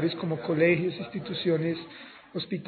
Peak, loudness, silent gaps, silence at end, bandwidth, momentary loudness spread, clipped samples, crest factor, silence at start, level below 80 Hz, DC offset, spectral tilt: -10 dBFS; -28 LUFS; none; 0 s; 4.6 kHz; 15 LU; under 0.1%; 18 dB; 0 s; -68 dBFS; under 0.1%; -5 dB/octave